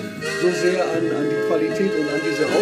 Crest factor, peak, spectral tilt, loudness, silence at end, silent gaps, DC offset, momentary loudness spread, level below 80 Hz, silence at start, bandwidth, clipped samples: 14 dB; -6 dBFS; -5 dB/octave; -21 LUFS; 0 s; none; under 0.1%; 2 LU; -62 dBFS; 0 s; 14.5 kHz; under 0.1%